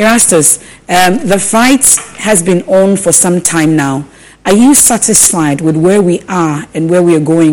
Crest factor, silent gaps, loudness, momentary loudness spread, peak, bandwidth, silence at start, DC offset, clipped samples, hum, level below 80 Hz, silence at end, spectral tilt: 8 dB; none; -8 LUFS; 8 LU; 0 dBFS; over 20 kHz; 0 s; under 0.1%; 0.7%; none; -40 dBFS; 0 s; -4 dB/octave